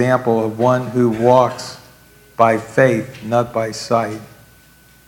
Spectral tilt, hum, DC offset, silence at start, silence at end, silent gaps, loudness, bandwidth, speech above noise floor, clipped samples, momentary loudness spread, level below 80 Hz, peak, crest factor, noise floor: -6.5 dB/octave; none; under 0.1%; 0 s; 0.85 s; none; -16 LUFS; 18 kHz; 32 dB; under 0.1%; 14 LU; -56 dBFS; 0 dBFS; 18 dB; -48 dBFS